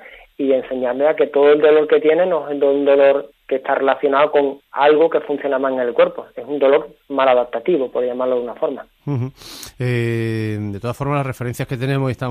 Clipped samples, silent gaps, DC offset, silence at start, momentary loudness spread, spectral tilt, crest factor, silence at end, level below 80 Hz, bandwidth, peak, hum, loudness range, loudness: under 0.1%; none; under 0.1%; 0 s; 11 LU; -7 dB/octave; 16 dB; 0 s; -54 dBFS; 14.5 kHz; 0 dBFS; none; 7 LU; -17 LUFS